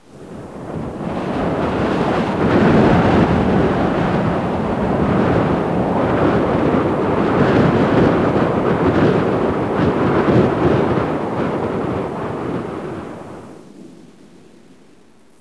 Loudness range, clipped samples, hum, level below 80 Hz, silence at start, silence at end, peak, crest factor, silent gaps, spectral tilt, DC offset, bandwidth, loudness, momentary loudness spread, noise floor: 9 LU; under 0.1%; none; -36 dBFS; 0.15 s; 1.4 s; -2 dBFS; 16 dB; none; -8 dB/octave; under 0.1%; 11 kHz; -17 LUFS; 13 LU; -50 dBFS